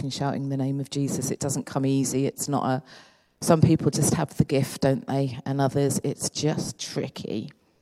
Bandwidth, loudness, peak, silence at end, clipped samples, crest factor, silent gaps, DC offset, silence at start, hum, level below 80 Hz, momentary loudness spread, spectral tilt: 15 kHz; -26 LUFS; -4 dBFS; 0.3 s; under 0.1%; 22 dB; none; under 0.1%; 0 s; none; -56 dBFS; 10 LU; -5.5 dB/octave